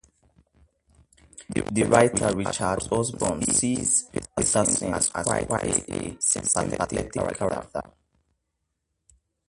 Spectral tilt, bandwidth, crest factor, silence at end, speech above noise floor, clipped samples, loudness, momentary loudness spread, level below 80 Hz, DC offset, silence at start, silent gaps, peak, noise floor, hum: -4 dB/octave; 11.5 kHz; 24 dB; 1.65 s; 54 dB; under 0.1%; -24 LUFS; 9 LU; -48 dBFS; under 0.1%; 1.4 s; none; -2 dBFS; -79 dBFS; none